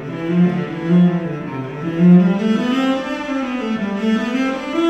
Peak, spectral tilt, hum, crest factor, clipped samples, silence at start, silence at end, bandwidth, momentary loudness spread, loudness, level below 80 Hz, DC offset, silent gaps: -2 dBFS; -8 dB/octave; none; 14 dB; under 0.1%; 0 s; 0 s; 8 kHz; 11 LU; -17 LUFS; -52 dBFS; under 0.1%; none